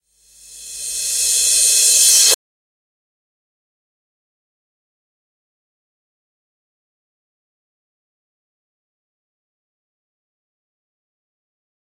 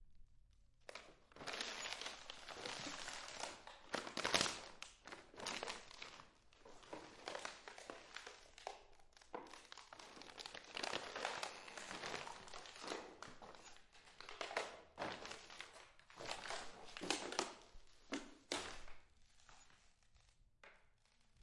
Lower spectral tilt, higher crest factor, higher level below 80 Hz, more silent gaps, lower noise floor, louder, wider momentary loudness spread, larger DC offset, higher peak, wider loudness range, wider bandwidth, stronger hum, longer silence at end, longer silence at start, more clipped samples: second, 4 dB/octave vs -1.5 dB/octave; second, 22 dB vs 34 dB; first, -60 dBFS vs -70 dBFS; neither; second, -48 dBFS vs -73 dBFS; first, -11 LUFS vs -48 LUFS; second, 16 LU vs 19 LU; neither; first, 0 dBFS vs -18 dBFS; second, 5 LU vs 10 LU; first, 16.5 kHz vs 11.5 kHz; neither; first, 9.65 s vs 0 s; first, 0.5 s vs 0 s; neither